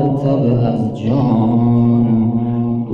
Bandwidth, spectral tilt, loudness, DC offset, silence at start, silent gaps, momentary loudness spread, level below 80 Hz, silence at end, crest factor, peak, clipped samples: 5.4 kHz; -11 dB/octave; -15 LUFS; under 0.1%; 0 s; none; 5 LU; -40 dBFS; 0 s; 10 dB; -4 dBFS; under 0.1%